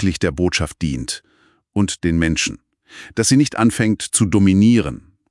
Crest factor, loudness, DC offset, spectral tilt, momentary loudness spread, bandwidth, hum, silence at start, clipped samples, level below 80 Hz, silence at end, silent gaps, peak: 16 dB; -17 LUFS; under 0.1%; -5 dB/octave; 13 LU; 12 kHz; none; 0 s; under 0.1%; -40 dBFS; 0.35 s; none; -2 dBFS